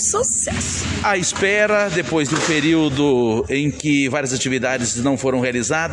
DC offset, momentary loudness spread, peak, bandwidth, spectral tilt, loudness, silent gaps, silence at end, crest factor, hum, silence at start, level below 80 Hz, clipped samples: under 0.1%; 4 LU; -4 dBFS; 11.5 kHz; -3.5 dB/octave; -18 LUFS; none; 0 s; 14 dB; none; 0 s; -44 dBFS; under 0.1%